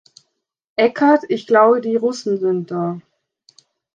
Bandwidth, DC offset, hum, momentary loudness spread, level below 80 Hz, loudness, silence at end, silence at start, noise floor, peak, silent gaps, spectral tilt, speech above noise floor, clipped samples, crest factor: 8.6 kHz; under 0.1%; none; 12 LU; -70 dBFS; -17 LUFS; 0.95 s; 0.8 s; -73 dBFS; -2 dBFS; none; -6 dB/octave; 57 dB; under 0.1%; 16 dB